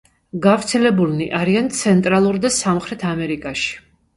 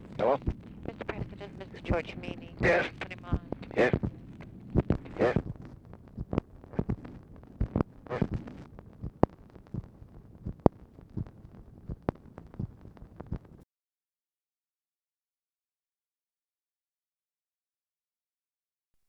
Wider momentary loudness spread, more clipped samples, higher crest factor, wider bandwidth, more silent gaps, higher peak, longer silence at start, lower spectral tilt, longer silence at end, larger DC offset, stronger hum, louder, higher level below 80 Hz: second, 8 LU vs 21 LU; neither; second, 18 dB vs 34 dB; first, 11.5 kHz vs 9.2 kHz; neither; about the same, 0 dBFS vs 0 dBFS; first, 0.35 s vs 0 s; second, -5 dB/octave vs -8 dB/octave; second, 0.4 s vs 5.6 s; neither; neither; first, -18 LUFS vs -33 LUFS; about the same, -50 dBFS vs -46 dBFS